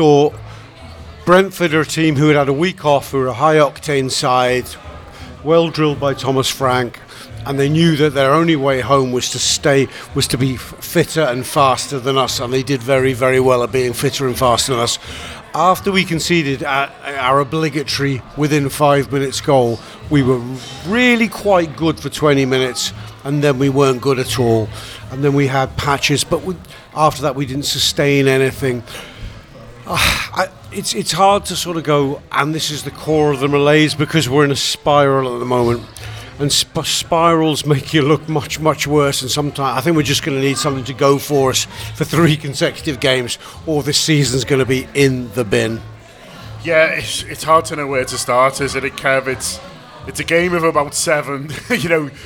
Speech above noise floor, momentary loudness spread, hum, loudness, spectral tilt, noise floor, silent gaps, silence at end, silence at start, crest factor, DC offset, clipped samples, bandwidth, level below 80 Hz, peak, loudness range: 22 dB; 11 LU; none; -15 LUFS; -4.5 dB/octave; -37 dBFS; none; 0 s; 0 s; 16 dB; under 0.1%; under 0.1%; 19.5 kHz; -42 dBFS; 0 dBFS; 2 LU